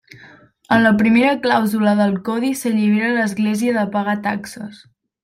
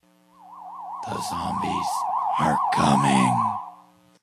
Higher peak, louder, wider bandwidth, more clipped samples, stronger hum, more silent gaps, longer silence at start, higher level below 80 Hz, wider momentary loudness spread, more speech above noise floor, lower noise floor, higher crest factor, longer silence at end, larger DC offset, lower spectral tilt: first, -2 dBFS vs -6 dBFS; first, -17 LUFS vs -23 LUFS; about the same, 15.5 kHz vs 14.5 kHz; neither; neither; neither; second, 0.2 s vs 0.45 s; about the same, -58 dBFS vs -54 dBFS; second, 10 LU vs 19 LU; about the same, 29 dB vs 30 dB; second, -46 dBFS vs -53 dBFS; about the same, 16 dB vs 18 dB; about the same, 0.5 s vs 0.5 s; neither; about the same, -5.5 dB/octave vs -5 dB/octave